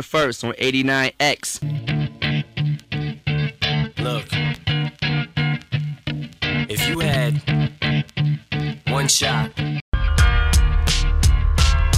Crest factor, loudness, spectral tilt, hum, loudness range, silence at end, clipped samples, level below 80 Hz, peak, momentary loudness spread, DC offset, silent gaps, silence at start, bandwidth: 18 dB; -21 LUFS; -4.5 dB/octave; none; 4 LU; 0 s; under 0.1%; -24 dBFS; -2 dBFS; 7 LU; under 0.1%; 9.81-9.92 s; 0 s; 15.5 kHz